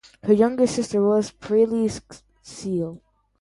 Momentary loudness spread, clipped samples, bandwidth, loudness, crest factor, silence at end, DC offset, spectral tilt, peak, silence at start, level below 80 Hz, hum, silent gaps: 15 LU; under 0.1%; 11.5 kHz; -22 LUFS; 18 dB; 0.45 s; under 0.1%; -6 dB/octave; -6 dBFS; 0.25 s; -56 dBFS; none; none